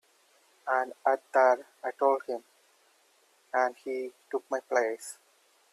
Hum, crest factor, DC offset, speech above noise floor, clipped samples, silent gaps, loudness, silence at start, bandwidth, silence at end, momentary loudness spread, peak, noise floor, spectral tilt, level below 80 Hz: none; 20 dB; under 0.1%; 37 dB; under 0.1%; none; -30 LUFS; 0.65 s; 14 kHz; 0.6 s; 15 LU; -12 dBFS; -66 dBFS; -2 dB/octave; -88 dBFS